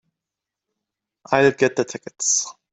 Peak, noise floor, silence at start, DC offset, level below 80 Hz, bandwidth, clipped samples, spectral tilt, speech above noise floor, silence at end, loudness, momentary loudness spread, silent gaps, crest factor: 0 dBFS; -86 dBFS; 1.3 s; under 0.1%; -64 dBFS; 8.4 kHz; under 0.1%; -3 dB/octave; 66 dB; 0.2 s; -20 LUFS; 8 LU; none; 22 dB